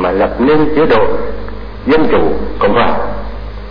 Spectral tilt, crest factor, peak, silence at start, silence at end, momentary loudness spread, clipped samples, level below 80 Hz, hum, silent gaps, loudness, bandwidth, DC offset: -8.5 dB/octave; 10 dB; -2 dBFS; 0 s; 0 s; 15 LU; under 0.1%; -26 dBFS; none; none; -13 LUFS; 5.2 kHz; 20%